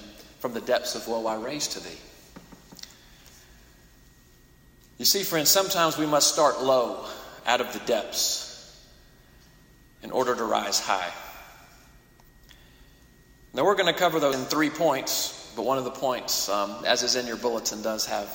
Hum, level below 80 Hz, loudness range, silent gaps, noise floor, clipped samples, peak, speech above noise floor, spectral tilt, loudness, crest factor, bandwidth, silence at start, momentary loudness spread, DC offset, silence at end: none; -58 dBFS; 9 LU; none; -56 dBFS; under 0.1%; -6 dBFS; 30 dB; -2 dB/octave; -25 LUFS; 22 dB; 16.5 kHz; 0 s; 18 LU; under 0.1%; 0 s